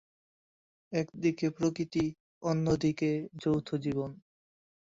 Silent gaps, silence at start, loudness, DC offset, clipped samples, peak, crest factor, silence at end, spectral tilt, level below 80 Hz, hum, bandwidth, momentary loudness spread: 2.20-2.41 s; 0.9 s; -32 LUFS; under 0.1%; under 0.1%; -16 dBFS; 16 dB; 0.7 s; -7 dB/octave; -60 dBFS; none; 7.8 kHz; 7 LU